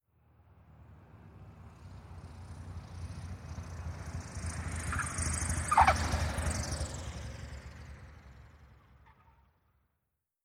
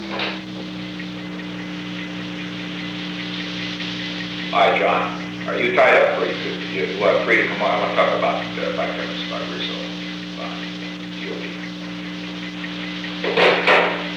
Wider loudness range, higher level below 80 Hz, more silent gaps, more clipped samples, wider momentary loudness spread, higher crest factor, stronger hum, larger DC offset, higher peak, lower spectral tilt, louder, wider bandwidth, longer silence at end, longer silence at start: first, 18 LU vs 10 LU; first, -44 dBFS vs -56 dBFS; neither; neither; first, 25 LU vs 14 LU; first, 26 dB vs 18 dB; second, none vs 60 Hz at -35 dBFS; neither; second, -10 dBFS vs -4 dBFS; about the same, -4 dB/octave vs -5 dB/octave; second, -34 LUFS vs -21 LUFS; first, 15.5 kHz vs 11 kHz; first, 1.45 s vs 0 s; first, 0.55 s vs 0 s